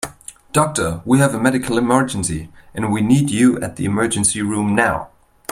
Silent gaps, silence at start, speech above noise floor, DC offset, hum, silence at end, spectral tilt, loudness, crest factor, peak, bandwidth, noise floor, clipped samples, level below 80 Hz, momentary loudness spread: none; 0 s; 20 dB; under 0.1%; none; 0.45 s; -5 dB/octave; -17 LUFS; 18 dB; 0 dBFS; 15.5 kHz; -37 dBFS; under 0.1%; -46 dBFS; 13 LU